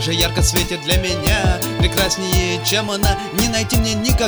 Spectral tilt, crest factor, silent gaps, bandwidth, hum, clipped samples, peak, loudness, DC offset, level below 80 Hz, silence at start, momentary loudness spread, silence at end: -3.5 dB/octave; 16 dB; none; over 20 kHz; none; under 0.1%; -2 dBFS; -17 LUFS; under 0.1%; -24 dBFS; 0 s; 2 LU; 0 s